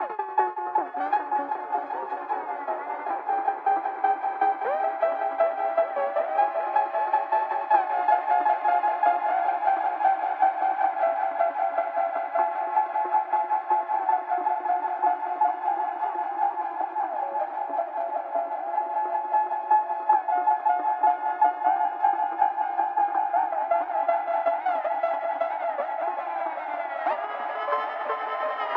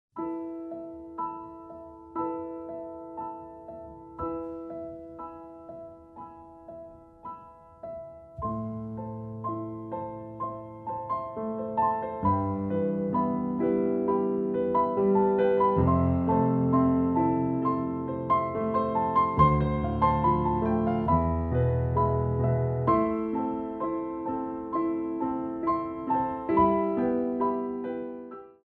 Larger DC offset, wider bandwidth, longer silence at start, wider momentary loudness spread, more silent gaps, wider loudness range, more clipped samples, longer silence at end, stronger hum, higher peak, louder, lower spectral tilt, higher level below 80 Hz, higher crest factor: neither; about the same, 4.5 kHz vs 4.5 kHz; second, 0 s vs 0.15 s; second, 6 LU vs 20 LU; neither; second, 5 LU vs 15 LU; neither; second, 0 s vs 0.15 s; neither; about the same, -8 dBFS vs -8 dBFS; about the same, -26 LUFS vs -28 LUFS; second, -5 dB/octave vs -11.5 dB/octave; second, -76 dBFS vs -46 dBFS; about the same, 18 dB vs 20 dB